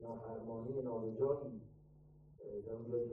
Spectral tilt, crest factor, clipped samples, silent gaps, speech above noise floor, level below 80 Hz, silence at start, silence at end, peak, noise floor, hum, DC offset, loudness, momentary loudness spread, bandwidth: -12.5 dB/octave; 18 dB; under 0.1%; none; 22 dB; -70 dBFS; 0 s; 0 s; -24 dBFS; -63 dBFS; none; under 0.1%; -43 LUFS; 15 LU; 2.5 kHz